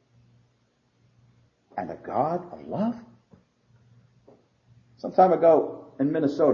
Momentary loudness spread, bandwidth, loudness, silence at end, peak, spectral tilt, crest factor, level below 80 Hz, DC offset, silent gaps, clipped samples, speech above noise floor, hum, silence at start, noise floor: 17 LU; 7 kHz; -24 LUFS; 0 s; -6 dBFS; -9 dB/octave; 20 dB; -70 dBFS; under 0.1%; none; under 0.1%; 45 dB; none; 1.75 s; -68 dBFS